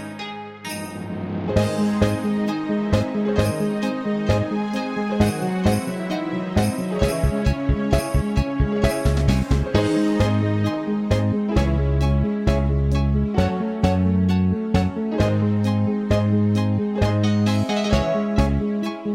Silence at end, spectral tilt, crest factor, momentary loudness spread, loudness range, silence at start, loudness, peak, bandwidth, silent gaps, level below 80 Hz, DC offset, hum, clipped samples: 0 s; -7 dB/octave; 18 dB; 5 LU; 2 LU; 0 s; -21 LUFS; -4 dBFS; 15.5 kHz; none; -28 dBFS; under 0.1%; none; under 0.1%